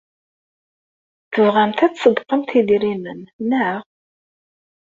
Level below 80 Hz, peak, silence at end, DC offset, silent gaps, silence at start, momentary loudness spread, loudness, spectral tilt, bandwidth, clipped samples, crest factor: -62 dBFS; -2 dBFS; 1.15 s; under 0.1%; 3.33-3.39 s; 1.3 s; 12 LU; -18 LUFS; -6.5 dB/octave; 7.6 kHz; under 0.1%; 18 dB